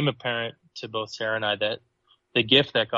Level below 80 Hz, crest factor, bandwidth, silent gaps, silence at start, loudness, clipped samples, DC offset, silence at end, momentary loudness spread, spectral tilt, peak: -66 dBFS; 22 dB; 7.8 kHz; none; 0 s; -25 LUFS; under 0.1%; under 0.1%; 0 s; 15 LU; -5 dB/octave; -4 dBFS